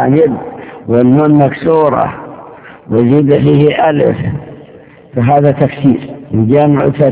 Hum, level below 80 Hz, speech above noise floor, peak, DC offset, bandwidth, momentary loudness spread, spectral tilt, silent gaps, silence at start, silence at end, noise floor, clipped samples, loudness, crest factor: none; -40 dBFS; 28 dB; 0 dBFS; under 0.1%; 4 kHz; 14 LU; -12.5 dB/octave; none; 0 s; 0 s; -37 dBFS; 1%; -10 LUFS; 10 dB